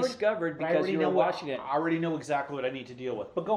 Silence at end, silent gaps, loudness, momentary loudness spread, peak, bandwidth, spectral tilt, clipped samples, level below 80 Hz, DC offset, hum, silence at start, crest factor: 0 s; none; -30 LUFS; 9 LU; -10 dBFS; 11.5 kHz; -6 dB/octave; under 0.1%; -72 dBFS; under 0.1%; none; 0 s; 18 dB